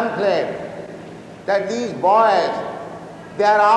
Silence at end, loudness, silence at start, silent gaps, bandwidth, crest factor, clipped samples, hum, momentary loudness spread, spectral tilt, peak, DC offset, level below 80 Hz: 0 s; -18 LUFS; 0 s; none; 10.5 kHz; 16 dB; under 0.1%; none; 20 LU; -5 dB/octave; -4 dBFS; under 0.1%; -62 dBFS